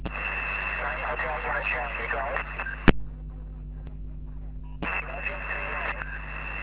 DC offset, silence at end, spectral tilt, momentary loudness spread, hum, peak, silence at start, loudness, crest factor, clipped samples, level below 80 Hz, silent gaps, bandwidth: under 0.1%; 0 s; -4 dB/octave; 16 LU; none; 0 dBFS; 0 s; -29 LUFS; 30 dB; under 0.1%; -38 dBFS; none; 4 kHz